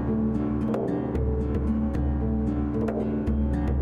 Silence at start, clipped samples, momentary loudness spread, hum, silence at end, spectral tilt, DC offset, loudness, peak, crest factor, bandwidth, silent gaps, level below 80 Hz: 0 s; under 0.1%; 1 LU; none; 0 s; -10.5 dB/octave; under 0.1%; -27 LUFS; -14 dBFS; 10 dB; 4.4 kHz; none; -32 dBFS